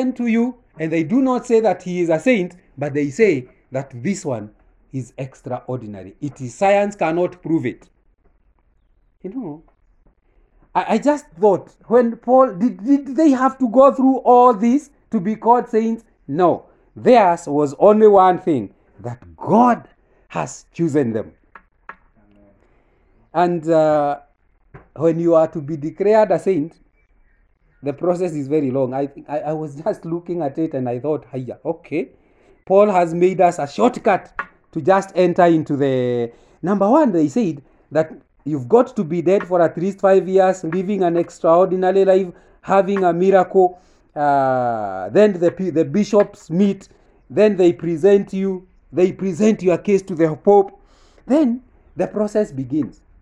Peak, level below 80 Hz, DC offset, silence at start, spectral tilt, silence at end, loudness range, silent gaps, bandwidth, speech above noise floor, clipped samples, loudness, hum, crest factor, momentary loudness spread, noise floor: 0 dBFS; -56 dBFS; under 0.1%; 0 s; -7.5 dB/octave; 0.3 s; 8 LU; none; 10.5 kHz; 42 dB; under 0.1%; -17 LUFS; none; 18 dB; 15 LU; -59 dBFS